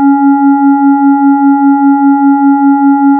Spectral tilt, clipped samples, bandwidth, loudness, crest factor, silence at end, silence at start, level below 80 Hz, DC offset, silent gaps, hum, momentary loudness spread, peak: -9 dB/octave; under 0.1%; 2.1 kHz; -7 LUFS; 4 dB; 0 s; 0 s; -72 dBFS; under 0.1%; none; none; 0 LU; -4 dBFS